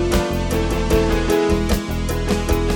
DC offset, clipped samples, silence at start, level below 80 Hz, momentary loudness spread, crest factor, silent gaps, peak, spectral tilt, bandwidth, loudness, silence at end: under 0.1%; under 0.1%; 0 s; -24 dBFS; 4 LU; 14 dB; none; -4 dBFS; -5.5 dB/octave; 19 kHz; -20 LUFS; 0 s